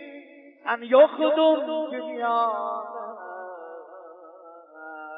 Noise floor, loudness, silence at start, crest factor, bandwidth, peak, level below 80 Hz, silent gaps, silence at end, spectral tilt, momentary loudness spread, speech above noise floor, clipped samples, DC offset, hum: -47 dBFS; -23 LUFS; 0 s; 20 dB; 4.9 kHz; -6 dBFS; under -90 dBFS; none; 0 s; -7 dB/octave; 25 LU; 25 dB; under 0.1%; under 0.1%; none